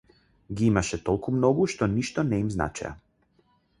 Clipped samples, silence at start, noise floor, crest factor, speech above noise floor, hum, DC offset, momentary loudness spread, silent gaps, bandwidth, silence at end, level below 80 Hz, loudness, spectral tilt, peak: under 0.1%; 0.5 s; -66 dBFS; 22 dB; 41 dB; none; under 0.1%; 10 LU; none; 11.5 kHz; 0.85 s; -46 dBFS; -26 LUFS; -6.5 dB/octave; -6 dBFS